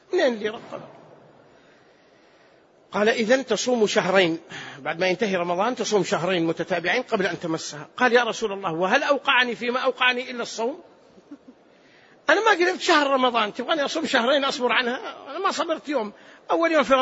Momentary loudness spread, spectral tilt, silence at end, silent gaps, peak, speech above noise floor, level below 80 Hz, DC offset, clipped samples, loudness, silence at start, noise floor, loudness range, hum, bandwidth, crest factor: 12 LU; -3.5 dB/octave; 0 s; none; -4 dBFS; 33 dB; -68 dBFS; under 0.1%; under 0.1%; -22 LUFS; 0.1 s; -56 dBFS; 4 LU; none; 8 kHz; 20 dB